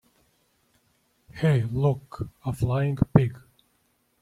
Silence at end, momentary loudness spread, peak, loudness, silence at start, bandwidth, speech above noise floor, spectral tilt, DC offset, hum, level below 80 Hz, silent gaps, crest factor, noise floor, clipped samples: 0.85 s; 12 LU; -4 dBFS; -25 LUFS; 1.35 s; 12.5 kHz; 45 dB; -8.5 dB/octave; under 0.1%; none; -48 dBFS; none; 24 dB; -69 dBFS; under 0.1%